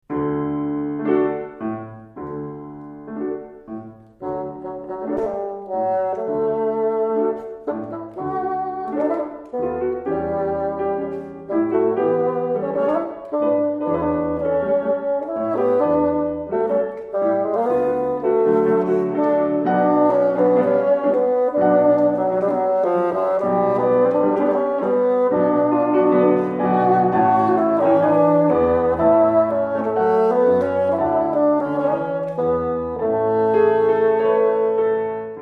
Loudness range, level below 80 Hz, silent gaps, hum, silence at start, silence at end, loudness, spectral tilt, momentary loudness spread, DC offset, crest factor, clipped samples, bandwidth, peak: 9 LU; -52 dBFS; none; none; 0.1 s; 0 s; -19 LUFS; -9.5 dB/octave; 12 LU; under 0.1%; 14 dB; under 0.1%; 4.9 kHz; -4 dBFS